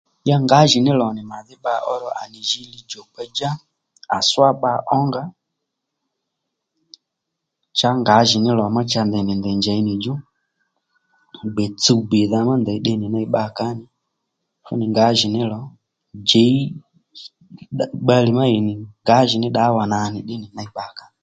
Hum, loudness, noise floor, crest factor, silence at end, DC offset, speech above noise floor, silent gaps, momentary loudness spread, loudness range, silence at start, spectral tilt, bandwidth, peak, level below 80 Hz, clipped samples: none; -18 LUFS; -79 dBFS; 20 dB; 0.25 s; under 0.1%; 61 dB; none; 18 LU; 4 LU; 0.25 s; -5 dB/octave; 9.2 kHz; 0 dBFS; -56 dBFS; under 0.1%